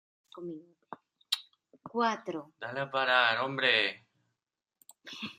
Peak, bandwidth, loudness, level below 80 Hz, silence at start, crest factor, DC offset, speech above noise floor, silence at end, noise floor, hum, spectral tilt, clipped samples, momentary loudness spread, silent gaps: -10 dBFS; 15 kHz; -30 LUFS; -82 dBFS; 0.35 s; 24 dB; under 0.1%; 57 dB; 0.05 s; -88 dBFS; none; -3 dB/octave; under 0.1%; 25 LU; none